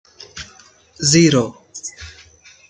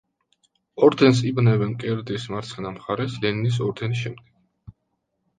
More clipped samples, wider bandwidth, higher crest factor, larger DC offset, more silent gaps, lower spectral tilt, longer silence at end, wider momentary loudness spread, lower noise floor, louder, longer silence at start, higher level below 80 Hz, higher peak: neither; about the same, 9.6 kHz vs 9.4 kHz; about the same, 18 dB vs 20 dB; neither; neither; second, -4 dB/octave vs -7 dB/octave; about the same, 0.6 s vs 0.7 s; first, 25 LU vs 14 LU; second, -48 dBFS vs -75 dBFS; first, -15 LUFS vs -22 LUFS; second, 0.35 s vs 0.75 s; about the same, -52 dBFS vs -56 dBFS; about the same, -2 dBFS vs -4 dBFS